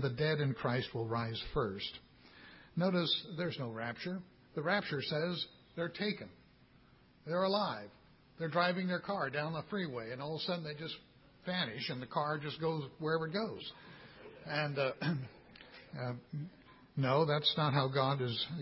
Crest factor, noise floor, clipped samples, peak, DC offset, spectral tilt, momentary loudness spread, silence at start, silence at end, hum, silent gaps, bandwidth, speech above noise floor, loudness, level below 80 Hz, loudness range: 20 dB; -64 dBFS; under 0.1%; -16 dBFS; under 0.1%; -9 dB/octave; 18 LU; 0 s; 0 s; none; none; 5.8 kHz; 28 dB; -37 LUFS; -66 dBFS; 4 LU